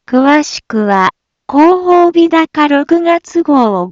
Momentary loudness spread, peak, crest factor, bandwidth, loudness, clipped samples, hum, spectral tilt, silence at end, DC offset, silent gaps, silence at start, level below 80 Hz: 6 LU; 0 dBFS; 10 dB; 7.6 kHz; -10 LUFS; under 0.1%; none; -5 dB/octave; 0 s; under 0.1%; none; 0.1 s; -54 dBFS